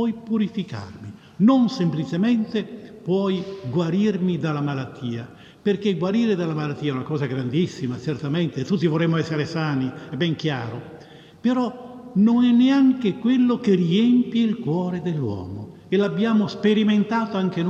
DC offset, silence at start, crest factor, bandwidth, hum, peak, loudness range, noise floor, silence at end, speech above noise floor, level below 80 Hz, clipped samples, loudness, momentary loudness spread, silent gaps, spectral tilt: under 0.1%; 0 s; 14 dB; 7.6 kHz; none; -8 dBFS; 5 LU; -44 dBFS; 0 s; 23 dB; -64 dBFS; under 0.1%; -22 LUFS; 13 LU; none; -7.5 dB/octave